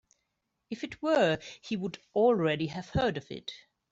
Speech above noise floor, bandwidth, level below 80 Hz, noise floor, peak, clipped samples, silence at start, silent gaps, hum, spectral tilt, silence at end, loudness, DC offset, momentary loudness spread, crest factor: 52 dB; 7.8 kHz; -58 dBFS; -82 dBFS; -14 dBFS; under 0.1%; 0.7 s; none; none; -6 dB/octave; 0.35 s; -30 LUFS; under 0.1%; 16 LU; 18 dB